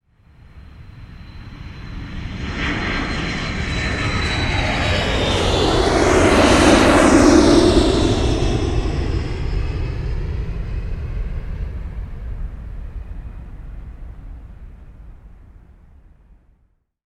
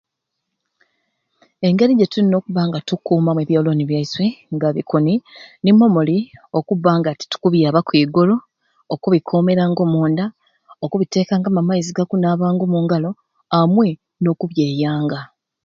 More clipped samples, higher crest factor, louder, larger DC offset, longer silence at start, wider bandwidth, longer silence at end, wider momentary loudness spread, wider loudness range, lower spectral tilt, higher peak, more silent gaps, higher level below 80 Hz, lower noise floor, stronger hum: neither; about the same, 18 dB vs 16 dB; about the same, -17 LUFS vs -17 LUFS; neither; second, 0.55 s vs 1.6 s; first, 13 kHz vs 7.4 kHz; first, 1.65 s vs 0.4 s; first, 25 LU vs 8 LU; first, 20 LU vs 2 LU; second, -5 dB/octave vs -7.5 dB/octave; about the same, 0 dBFS vs 0 dBFS; neither; first, -26 dBFS vs -60 dBFS; second, -62 dBFS vs -78 dBFS; neither